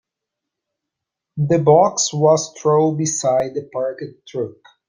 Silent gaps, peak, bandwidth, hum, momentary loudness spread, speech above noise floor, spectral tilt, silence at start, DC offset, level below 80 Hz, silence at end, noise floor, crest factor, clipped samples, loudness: none; -2 dBFS; 10 kHz; none; 15 LU; 65 dB; -5 dB/octave; 1.35 s; under 0.1%; -60 dBFS; 0.35 s; -82 dBFS; 18 dB; under 0.1%; -18 LUFS